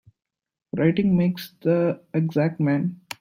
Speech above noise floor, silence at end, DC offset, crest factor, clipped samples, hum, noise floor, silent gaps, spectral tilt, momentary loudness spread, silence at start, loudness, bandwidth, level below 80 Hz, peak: 40 dB; 0.25 s; under 0.1%; 16 dB; under 0.1%; none; -62 dBFS; none; -8.5 dB/octave; 7 LU; 0.75 s; -23 LUFS; 16 kHz; -60 dBFS; -6 dBFS